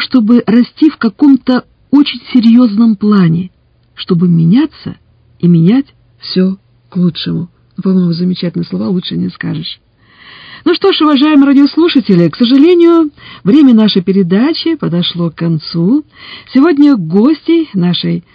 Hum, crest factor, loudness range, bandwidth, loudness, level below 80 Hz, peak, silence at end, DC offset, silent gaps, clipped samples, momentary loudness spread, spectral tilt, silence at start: none; 10 dB; 7 LU; 5.2 kHz; -10 LUFS; -52 dBFS; 0 dBFS; 0.15 s; under 0.1%; none; 1%; 12 LU; -9 dB/octave; 0 s